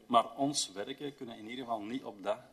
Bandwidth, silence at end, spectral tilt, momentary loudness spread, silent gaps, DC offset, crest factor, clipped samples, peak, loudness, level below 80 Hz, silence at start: 13.5 kHz; 0.05 s; -3 dB/octave; 13 LU; none; under 0.1%; 22 dB; under 0.1%; -14 dBFS; -36 LUFS; -78 dBFS; 0.1 s